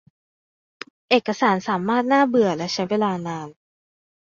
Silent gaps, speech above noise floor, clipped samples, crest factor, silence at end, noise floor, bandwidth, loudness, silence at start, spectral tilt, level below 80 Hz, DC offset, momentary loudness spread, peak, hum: none; over 70 dB; under 0.1%; 20 dB; 0.85 s; under -90 dBFS; 7.6 kHz; -21 LUFS; 1.1 s; -5.5 dB/octave; -66 dBFS; under 0.1%; 22 LU; -2 dBFS; none